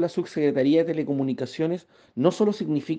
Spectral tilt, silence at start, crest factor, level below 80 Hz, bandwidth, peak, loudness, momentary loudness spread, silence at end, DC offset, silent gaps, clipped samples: -7.5 dB/octave; 0 s; 18 dB; -70 dBFS; 9.2 kHz; -6 dBFS; -24 LUFS; 7 LU; 0 s; under 0.1%; none; under 0.1%